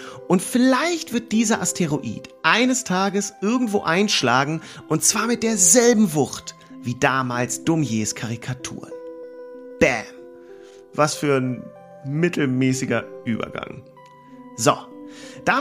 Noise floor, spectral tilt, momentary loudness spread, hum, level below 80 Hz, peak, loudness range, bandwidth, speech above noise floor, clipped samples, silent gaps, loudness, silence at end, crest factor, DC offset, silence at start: -45 dBFS; -3.5 dB/octave; 19 LU; none; -58 dBFS; -2 dBFS; 7 LU; 15.5 kHz; 24 dB; under 0.1%; none; -20 LUFS; 0 s; 20 dB; under 0.1%; 0 s